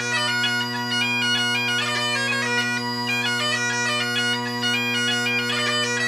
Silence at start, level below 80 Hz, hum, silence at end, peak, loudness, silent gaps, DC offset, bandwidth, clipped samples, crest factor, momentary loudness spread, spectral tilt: 0 s; -72 dBFS; none; 0 s; -10 dBFS; -21 LUFS; none; under 0.1%; 15.5 kHz; under 0.1%; 14 dB; 3 LU; -2 dB/octave